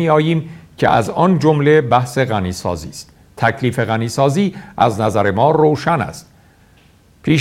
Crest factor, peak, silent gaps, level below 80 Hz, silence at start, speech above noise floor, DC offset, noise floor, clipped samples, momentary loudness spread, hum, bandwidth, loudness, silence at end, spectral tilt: 16 dB; 0 dBFS; none; -46 dBFS; 0 s; 34 dB; under 0.1%; -49 dBFS; under 0.1%; 13 LU; none; 15.5 kHz; -16 LUFS; 0 s; -6.5 dB/octave